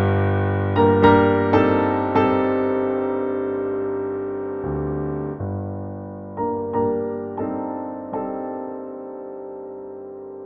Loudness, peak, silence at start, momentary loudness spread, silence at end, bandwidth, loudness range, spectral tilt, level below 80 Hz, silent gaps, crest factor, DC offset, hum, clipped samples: -21 LUFS; -2 dBFS; 0 s; 17 LU; 0 s; 5.8 kHz; 9 LU; -10 dB/octave; -48 dBFS; none; 20 dB; under 0.1%; 50 Hz at -60 dBFS; under 0.1%